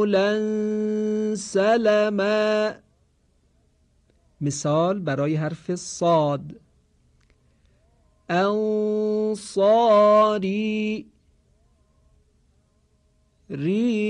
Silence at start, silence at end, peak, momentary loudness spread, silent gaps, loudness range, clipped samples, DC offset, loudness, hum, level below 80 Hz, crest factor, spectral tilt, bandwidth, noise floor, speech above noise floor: 0 s; 0 s; -8 dBFS; 12 LU; none; 7 LU; under 0.1%; under 0.1%; -22 LUFS; none; -62 dBFS; 14 dB; -5.5 dB/octave; 10.5 kHz; -64 dBFS; 42 dB